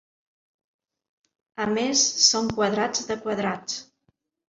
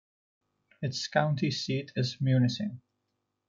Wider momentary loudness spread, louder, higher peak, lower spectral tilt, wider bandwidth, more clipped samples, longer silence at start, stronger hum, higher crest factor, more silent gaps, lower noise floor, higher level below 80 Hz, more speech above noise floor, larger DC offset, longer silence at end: first, 14 LU vs 11 LU; first, -23 LUFS vs -30 LUFS; first, -4 dBFS vs -12 dBFS; second, -2 dB/octave vs -6 dB/octave; about the same, 7.8 kHz vs 7.6 kHz; neither; first, 1.6 s vs 0.8 s; neither; about the same, 24 dB vs 20 dB; neither; second, -71 dBFS vs -81 dBFS; first, -60 dBFS vs -70 dBFS; second, 47 dB vs 52 dB; neither; about the same, 0.65 s vs 0.7 s